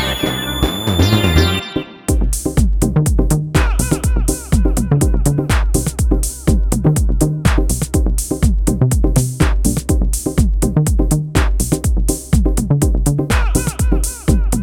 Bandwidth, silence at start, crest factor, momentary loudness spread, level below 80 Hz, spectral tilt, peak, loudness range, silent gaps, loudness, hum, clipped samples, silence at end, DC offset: 17.5 kHz; 0 s; 14 dB; 3 LU; -18 dBFS; -5 dB/octave; 0 dBFS; 1 LU; none; -16 LUFS; none; under 0.1%; 0 s; under 0.1%